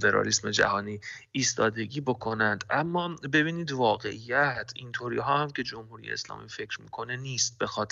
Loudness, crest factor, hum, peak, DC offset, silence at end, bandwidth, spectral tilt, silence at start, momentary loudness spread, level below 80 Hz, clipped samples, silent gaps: -28 LUFS; 20 dB; none; -8 dBFS; under 0.1%; 0.05 s; 8.2 kHz; -3.5 dB/octave; 0 s; 12 LU; -62 dBFS; under 0.1%; none